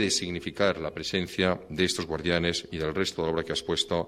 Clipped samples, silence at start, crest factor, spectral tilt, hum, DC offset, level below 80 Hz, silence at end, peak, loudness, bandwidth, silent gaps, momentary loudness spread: under 0.1%; 0 s; 20 dB; -4 dB/octave; none; under 0.1%; -50 dBFS; 0 s; -10 dBFS; -28 LUFS; 15.5 kHz; none; 4 LU